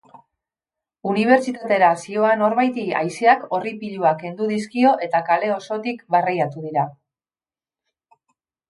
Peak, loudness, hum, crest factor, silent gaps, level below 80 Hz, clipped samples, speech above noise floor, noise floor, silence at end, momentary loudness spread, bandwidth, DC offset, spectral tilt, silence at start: -2 dBFS; -20 LUFS; none; 18 dB; none; -72 dBFS; under 0.1%; over 71 dB; under -90 dBFS; 1.8 s; 8 LU; 11.5 kHz; under 0.1%; -6 dB/octave; 1.05 s